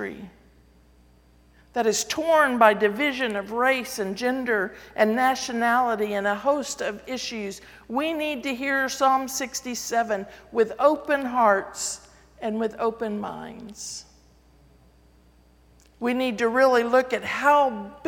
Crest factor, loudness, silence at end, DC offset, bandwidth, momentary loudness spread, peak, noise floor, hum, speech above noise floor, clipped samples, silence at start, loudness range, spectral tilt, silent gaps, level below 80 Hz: 22 dB; -24 LUFS; 0 s; under 0.1%; 18 kHz; 14 LU; -2 dBFS; -56 dBFS; none; 33 dB; under 0.1%; 0 s; 10 LU; -3 dB/octave; none; -58 dBFS